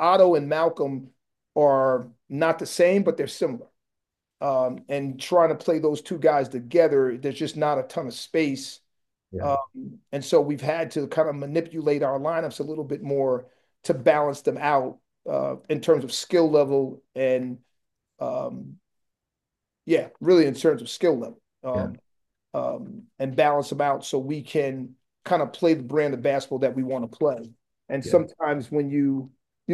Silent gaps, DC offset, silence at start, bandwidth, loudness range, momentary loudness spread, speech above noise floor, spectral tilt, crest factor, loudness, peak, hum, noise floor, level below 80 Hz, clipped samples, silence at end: none; under 0.1%; 0 s; 12.5 kHz; 4 LU; 14 LU; 62 dB; -6 dB/octave; 18 dB; -24 LUFS; -6 dBFS; none; -85 dBFS; -70 dBFS; under 0.1%; 0 s